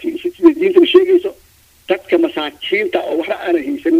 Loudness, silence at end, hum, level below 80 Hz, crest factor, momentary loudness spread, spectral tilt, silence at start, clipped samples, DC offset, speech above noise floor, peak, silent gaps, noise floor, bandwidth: -15 LUFS; 0 s; none; -56 dBFS; 14 dB; 11 LU; -5 dB/octave; 0 s; under 0.1%; under 0.1%; 33 dB; 0 dBFS; none; -49 dBFS; 15 kHz